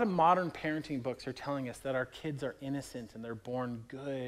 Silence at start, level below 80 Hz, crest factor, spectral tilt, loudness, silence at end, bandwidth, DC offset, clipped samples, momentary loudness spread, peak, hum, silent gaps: 0 s; -66 dBFS; 20 dB; -6.5 dB/octave; -36 LUFS; 0 s; 15.5 kHz; under 0.1%; under 0.1%; 15 LU; -14 dBFS; none; none